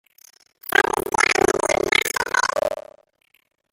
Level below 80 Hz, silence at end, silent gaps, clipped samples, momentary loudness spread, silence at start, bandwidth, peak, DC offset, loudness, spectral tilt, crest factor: -50 dBFS; 0.9 s; none; under 0.1%; 9 LU; 0.75 s; 17 kHz; 0 dBFS; under 0.1%; -19 LUFS; -1.5 dB/octave; 22 dB